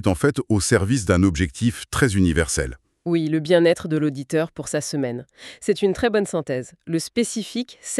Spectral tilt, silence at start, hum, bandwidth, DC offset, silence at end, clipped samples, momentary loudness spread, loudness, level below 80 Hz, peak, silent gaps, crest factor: -5 dB/octave; 0 s; none; 13.5 kHz; under 0.1%; 0 s; under 0.1%; 11 LU; -22 LUFS; -40 dBFS; -4 dBFS; none; 18 dB